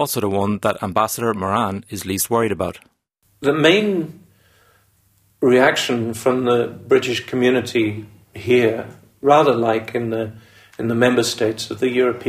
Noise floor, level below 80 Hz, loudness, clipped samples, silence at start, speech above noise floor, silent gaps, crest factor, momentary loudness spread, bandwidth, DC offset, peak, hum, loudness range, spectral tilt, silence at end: -63 dBFS; -56 dBFS; -19 LUFS; under 0.1%; 0 s; 45 dB; none; 18 dB; 12 LU; 15.5 kHz; under 0.1%; 0 dBFS; none; 3 LU; -4.5 dB/octave; 0 s